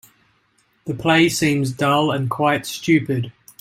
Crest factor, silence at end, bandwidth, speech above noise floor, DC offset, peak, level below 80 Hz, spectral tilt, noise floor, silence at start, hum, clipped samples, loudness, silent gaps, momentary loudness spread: 18 dB; 0.3 s; 16.5 kHz; 44 dB; under 0.1%; -2 dBFS; -56 dBFS; -5 dB/octave; -62 dBFS; 0.85 s; none; under 0.1%; -19 LUFS; none; 11 LU